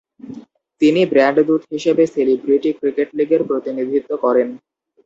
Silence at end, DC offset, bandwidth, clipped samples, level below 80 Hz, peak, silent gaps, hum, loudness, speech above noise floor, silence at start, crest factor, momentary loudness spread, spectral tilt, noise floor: 0.5 s; under 0.1%; 7.8 kHz; under 0.1%; -64 dBFS; -2 dBFS; none; none; -17 LUFS; 22 dB; 0.25 s; 16 dB; 8 LU; -6.5 dB/octave; -38 dBFS